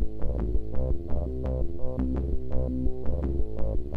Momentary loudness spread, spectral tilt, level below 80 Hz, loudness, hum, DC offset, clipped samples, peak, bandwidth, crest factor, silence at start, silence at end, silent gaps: 3 LU; -11 dB/octave; -30 dBFS; -32 LUFS; none; under 0.1%; under 0.1%; -10 dBFS; 2.4 kHz; 14 dB; 0 s; 0 s; none